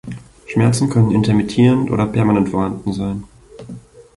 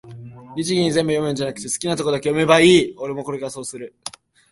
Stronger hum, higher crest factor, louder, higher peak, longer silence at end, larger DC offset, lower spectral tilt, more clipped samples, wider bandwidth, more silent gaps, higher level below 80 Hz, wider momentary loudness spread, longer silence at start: neither; second, 14 dB vs 20 dB; first, -16 LUFS vs -19 LUFS; about the same, -2 dBFS vs 0 dBFS; about the same, 0.4 s vs 0.4 s; neither; first, -7 dB/octave vs -4.5 dB/octave; neither; about the same, 11.5 kHz vs 11.5 kHz; neither; first, -42 dBFS vs -56 dBFS; about the same, 21 LU vs 20 LU; about the same, 0.05 s vs 0.05 s